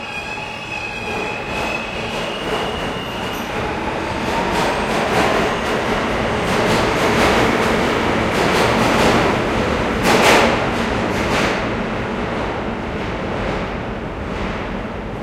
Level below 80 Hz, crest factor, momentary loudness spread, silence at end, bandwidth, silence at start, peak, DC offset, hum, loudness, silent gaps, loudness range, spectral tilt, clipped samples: -34 dBFS; 18 dB; 10 LU; 0 s; 16.5 kHz; 0 s; 0 dBFS; under 0.1%; none; -18 LUFS; none; 7 LU; -4.5 dB/octave; under 0.1%